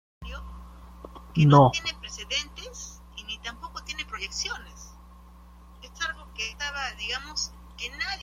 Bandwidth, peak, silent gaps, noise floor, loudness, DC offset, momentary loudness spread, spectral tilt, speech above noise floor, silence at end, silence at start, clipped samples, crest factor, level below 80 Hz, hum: 11 kHz; -4 dBFS; none; -49 dBFS; -27 LUFS; under 0.1%; 25 LU; -5 dB/octave; 27 dB; 0 s; 0.2 s; under 0.1%; 24 dB; -46 dBFS; none